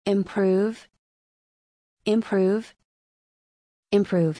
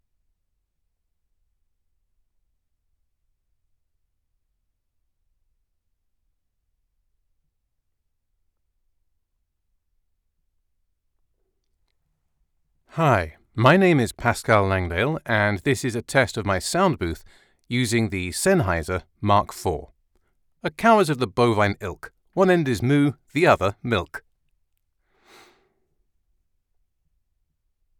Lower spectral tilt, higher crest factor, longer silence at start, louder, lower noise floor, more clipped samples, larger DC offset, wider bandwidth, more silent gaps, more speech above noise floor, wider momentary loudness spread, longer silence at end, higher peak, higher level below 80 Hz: first, -7.5 dB/octave vs -5.5 dB/octave; about the same, 18 dB vs 20 dB; second, 0.05 s vs 12.95 s; second, -24 LUFS vs -21 LUFS; first, under -90 dBFS vs -74 dBFS; neither; neither; second, 10.5 kHz vs 19 kHz; first, 0.99-1.97 s, 2.85-3.83 s vs none; first, over 68 dB vs 53 dB; second, 7 LU vs 14 LU; second, 0 s vs 3.8 s; second, -8 dBFS vs -4 dBFS; second, -66 dBFS vs -50 dBFS